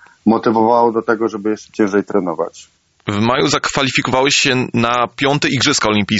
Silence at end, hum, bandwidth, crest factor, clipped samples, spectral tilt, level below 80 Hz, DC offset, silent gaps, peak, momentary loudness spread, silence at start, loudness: 0 s; none; 8 kHz; 14 dB; under 0.1%; -4 dB/octave; -50 dBFS; under 0.1%; none; -2 dBFS; 9 LU; 0.25 s; -15 LUFS